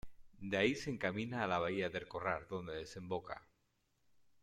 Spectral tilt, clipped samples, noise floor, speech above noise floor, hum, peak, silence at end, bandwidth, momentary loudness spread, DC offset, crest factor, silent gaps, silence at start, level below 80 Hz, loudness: -5.5 dB/octave; under 0.1%; -80 dBFS; 40 dB; none; -20 dBFS; 0.2 s; 14 kHz; 11 LU; under 0.1%; 20 dB; none; 0.05 s; -66 dBFS; -39 LUFS